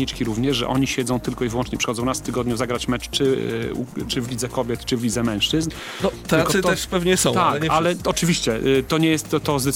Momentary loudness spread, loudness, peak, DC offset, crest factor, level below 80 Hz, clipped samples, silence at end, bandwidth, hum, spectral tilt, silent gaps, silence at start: 7 LU; -21 LUFS; -4 dBFS; under 0.1%; 16 dB; -40 dBFS; under 0.1%; 0 s; 17 kHz; none; -4.5 dB/octave; none; 0 s